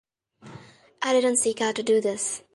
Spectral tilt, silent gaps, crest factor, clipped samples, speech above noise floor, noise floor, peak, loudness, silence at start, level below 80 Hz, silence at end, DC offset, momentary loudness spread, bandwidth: -2 dB/octave; none; 16 dB; under 0.1%; 26 dB; -50 dBFS; -10 dBFS; -24 LUFS; 0.45 s; -72 dBFS; 0.15 s; under 0.1%; 7 LU; 11.5 kHz